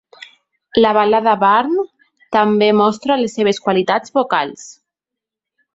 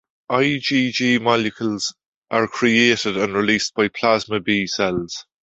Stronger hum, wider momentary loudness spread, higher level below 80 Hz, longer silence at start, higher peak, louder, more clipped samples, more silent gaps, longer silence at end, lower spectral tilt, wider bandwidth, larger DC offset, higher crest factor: neither; about the same, 8 LU vs 8 LU; about the same, -58 dBFS vs -56 dBFS; first, 0.75 s vs 0.3 s; about the same, 0 dBFS vs -2 dBFS; first, -15 LUFS vs -19 LUFS; neither; second, none vs 2.06-2.22 s; first, 1.05 s vs 0.2 s; about the same, -5 dB/octave vs -4 dB/octave; about the same, 8 kHz vs 8 kHz; neither; about the same, 16 dB vs 18 dB